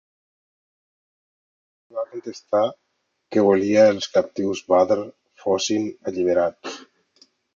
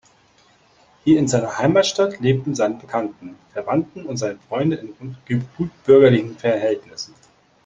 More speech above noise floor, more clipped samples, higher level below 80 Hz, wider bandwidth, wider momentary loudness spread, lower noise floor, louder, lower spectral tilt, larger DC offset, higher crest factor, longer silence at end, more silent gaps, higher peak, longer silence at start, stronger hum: first, 46 dB vs 36 dB; neither; second, -62 dBFS vs -54 dBFS; about the same, 7.4 kHz vs 8 kHz; about the same, 18 LU vs 17 LU; first, -66 dBFS vs -56 dBFS; about the same, -21 LUFS vs -19 LUFS; about the same, -5 dB/octave vs -6 dB/octave; neither; about the same, 20 dB vs 18 dB; first, 0.75 s vs 0.6 s; neither; about the same, -4 dBFS vs -2 dBFS; first, 1.95 s vs 1.05 s; neither